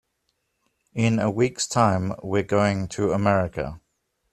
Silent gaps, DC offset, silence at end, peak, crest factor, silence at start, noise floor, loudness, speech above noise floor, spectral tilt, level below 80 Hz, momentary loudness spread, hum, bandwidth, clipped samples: none; under 0.1%; 0.55 s; -4 dBFS; 20 dB; 0.95 s; -74 dBFS; -23 LUFS; 52 dB; -5.5 dB/octave; -52 dBFS; 8 LU; none; 13 kHz; under 0.1%